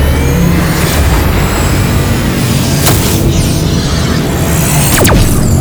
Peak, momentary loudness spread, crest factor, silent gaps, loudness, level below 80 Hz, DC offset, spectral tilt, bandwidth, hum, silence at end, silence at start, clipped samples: 0 dBFS; 4 LU; 8 dB; none; -10 LUFS; -16 dBFS; under 0.1%; -5 dB/octave; over 20 kHz; none; 0 s; 0 s; 0.2%